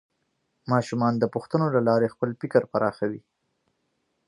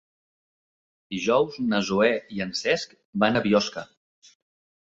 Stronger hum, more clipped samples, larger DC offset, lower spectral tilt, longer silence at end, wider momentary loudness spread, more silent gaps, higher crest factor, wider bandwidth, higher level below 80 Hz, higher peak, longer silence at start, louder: neither; neither; neither; first, -8 dB/octave vs -4.5 dB/octave; about the same, 1.1 s vs 1.05 s; about the same, 9 LU vs 10 LU; second, none vs 3.05-3.13 s; about the same, 20 dB vs 20 dB; first, 11 kHz vs 8 kHz; about the same, -66 dBFS vs -62 dBFS; about the same, -6 dBFS vs -6 dBFS; second, 0.65 s vs 1.1 s; about the same, -25 LUFS vs -24 LUFS